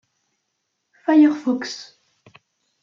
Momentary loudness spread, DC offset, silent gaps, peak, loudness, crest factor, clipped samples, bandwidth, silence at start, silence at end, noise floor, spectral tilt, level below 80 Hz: 16 LU; under 0.1%; none; -4 dBFS; -19 LUFS; 18 dB; under 0.1%; 7.4 kHz; 1.1 s; 1 s; -75 dBFS; -4 dB/octave; -76 dBFS